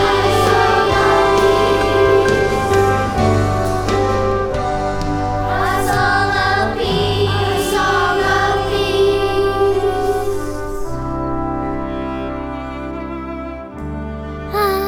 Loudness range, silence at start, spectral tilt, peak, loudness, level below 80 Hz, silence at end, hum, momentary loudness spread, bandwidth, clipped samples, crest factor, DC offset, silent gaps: 10 LU; 0 s; -5.5 dB/octave; -2 dBFS; -16 LUFS; -30 dBFS; 0 s; none; 13 LU; 19.5 kHz; under 0.1%; 14 dB; under 0.1%; none